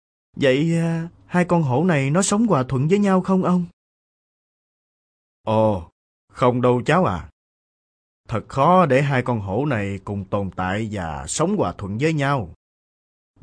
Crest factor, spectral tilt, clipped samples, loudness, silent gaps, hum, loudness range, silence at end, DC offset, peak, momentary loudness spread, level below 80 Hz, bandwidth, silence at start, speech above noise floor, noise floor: 16 dB; -6 dB/octave; under 0.1%; -20 LUFS; 3.73-5.44 s, 5.92-6.28 s, 7.33-8.24 s; none; 5 LU; 0.9 s; under 0.1%; -4 dBFS; 10 LU; -50 dBFS; 11 kHz; 0.35 s; over 71 dB; under -90 dBFS